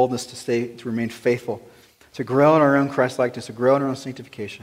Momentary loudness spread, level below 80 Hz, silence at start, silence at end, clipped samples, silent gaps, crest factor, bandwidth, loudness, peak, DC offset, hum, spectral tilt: 17 LU; -64 dBFS; 0 s; 0.05 s; under 0.1%; none; 18 dB; 16 kHz; -21 LUFS; -4 dBFS; under 0.1%; none; -6 dB/octave